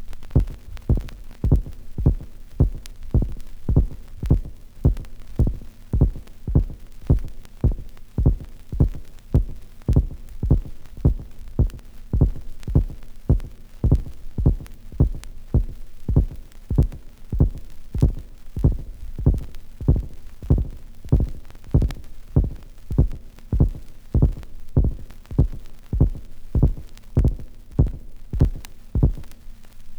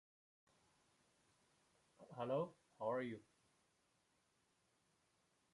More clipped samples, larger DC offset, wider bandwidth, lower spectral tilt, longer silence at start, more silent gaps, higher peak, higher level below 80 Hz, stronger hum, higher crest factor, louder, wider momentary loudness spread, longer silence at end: neither; neither; second, 8.8 kHz vs 11 kHz; first, -9.5 dB/octave vs -7 dB/octave; second, 0 s vs 2 s; neither; first, -4 dBFS vs -30 dBFS; first, -26 dBFS vs under -90 dBFS; neither; about the same, 20 dB vs 22 dB; first, -24 LUFS vs -46 LUFS; first, 17 LU vs 12 LU; second, 0 s vs 2.35 s